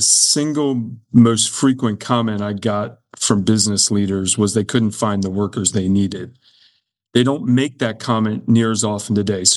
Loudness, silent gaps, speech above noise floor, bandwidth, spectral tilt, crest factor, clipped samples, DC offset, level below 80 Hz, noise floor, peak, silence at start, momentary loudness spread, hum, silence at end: -17 LUFS; none; 42 dB; 13.5 kHz; -4 dB/octave; 16 dB; under 0.1%; under 0.1%; -60 dBFS; -59 dBFS; 0 dBFS; 0 s; 8 LU; none; 0 s